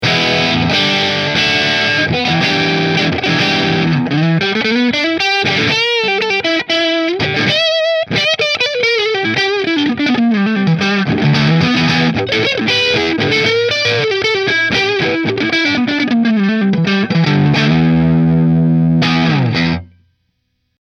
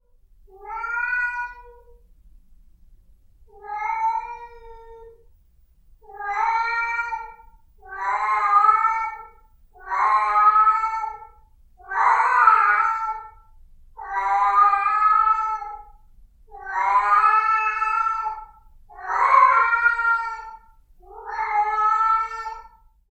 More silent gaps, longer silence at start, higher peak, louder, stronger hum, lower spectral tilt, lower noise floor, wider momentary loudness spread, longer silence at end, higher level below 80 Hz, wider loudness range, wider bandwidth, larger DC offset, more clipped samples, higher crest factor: neither; second, 0 s vs 0.6 s; about the same, 0 dBFS vs -2 dBFS; first, -13 LUFS vs -20 LUFS; neither; first, -5.5 dB/octave vs -1.5 dB/octave; first, -66 dBFS vs -56 dBFS; second, 2 LU vs 20 LU; first, 1 s vs 0.5 s; first, -44 dBFS vs -52 dBFS; second, 1 LU vs 12 LU; about the same, 8.2 kHz vs 8.4 kHz; neither; neither; second, 14 dB vs 20 dB